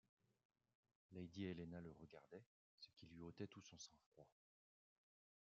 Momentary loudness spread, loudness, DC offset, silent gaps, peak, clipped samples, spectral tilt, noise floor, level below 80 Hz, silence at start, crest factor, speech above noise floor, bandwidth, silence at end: 13 LU; -58 LUFS; under 0.1%; 2.46-2.78 s, 4.06-4.12 s; -38 dBFS; under 0.1%; -6 dB/octave; under -90 dBFS; -86 dBFS; 1.1 s; 22 dB; over 32 dB; 7.4 kHz; 1.2 s